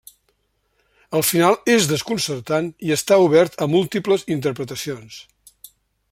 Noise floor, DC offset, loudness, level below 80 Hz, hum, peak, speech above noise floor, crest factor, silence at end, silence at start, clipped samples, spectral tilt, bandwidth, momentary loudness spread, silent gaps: -68 dBFS; under 0.1%; -19 LUFS; -60 dBFS; none; -2 dBFS; 49 dB; 18 dB; 0.9 s; 1.1 s; under 0.1%; -4.5 dB/octave; 16.5 kHz; 13 LU; none